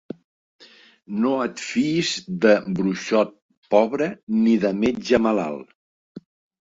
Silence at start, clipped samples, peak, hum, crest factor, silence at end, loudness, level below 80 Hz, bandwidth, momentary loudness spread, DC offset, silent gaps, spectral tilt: 0.6 s; under 0.1%; -2 dBFS; none; 20 dB; 0.45 s; -21 LUFS; -58 dBFS; 8 kHz; 9 LU; under 0.1%; 3.42-3.49 s, 3.57-3.62 s, 4.23-4.27 s, 5.75-6.15 s; -5.5 dB/octave